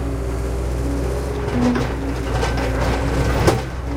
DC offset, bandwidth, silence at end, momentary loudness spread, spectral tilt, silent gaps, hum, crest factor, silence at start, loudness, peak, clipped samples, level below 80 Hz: under 0.1%; 16 kHz; 0 s; 6 LU; -6 dB/octave; none; none; 18 dB; 0 s; -21 LUFS; -2 dBFS; under 0.1%; -24 dBFS